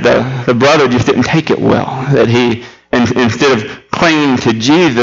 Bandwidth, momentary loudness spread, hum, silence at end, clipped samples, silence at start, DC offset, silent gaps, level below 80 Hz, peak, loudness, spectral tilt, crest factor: 7.8 kHz; 5 LU; none; 0 s; under 0.1%; 0 s; under 0.1%; none; -42 dBFS; 0 dBFS; -11 LUFS; -5.5 dB/octave; 10 dB